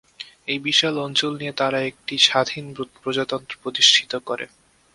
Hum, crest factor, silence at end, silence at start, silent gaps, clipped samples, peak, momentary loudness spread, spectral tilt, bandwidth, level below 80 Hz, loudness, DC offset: none; 22 dB; 0.5 s; 0.2 s; none; under 0.1%; 0 dBFS; 16 LU; -2 dB/octave; 11.5 kHz; -64 dBFS; -20 LUFS; under 0.1%